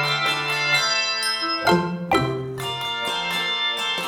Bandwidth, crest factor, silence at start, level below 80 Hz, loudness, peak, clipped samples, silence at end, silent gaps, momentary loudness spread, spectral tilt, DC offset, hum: 18 kHz; 18 dB; 0 s; -54 dBFS; -21 LUFS; -6 dBFS; under 0.1%; 0 s; none; 7 LU; -3 dB/octave; under 0.1%; none